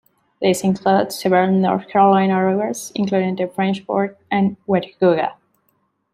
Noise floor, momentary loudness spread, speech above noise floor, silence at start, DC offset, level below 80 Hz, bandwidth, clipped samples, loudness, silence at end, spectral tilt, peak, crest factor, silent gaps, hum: -66 dBFS; 7 LU; 49 dB; 0.4 s; under 0.1%; -62 dBFS; 15 kHz; under 0.1%; -18 LUFS; 0.8 s; -6 dB/octave; -2 dBFS; 16 dB; none; none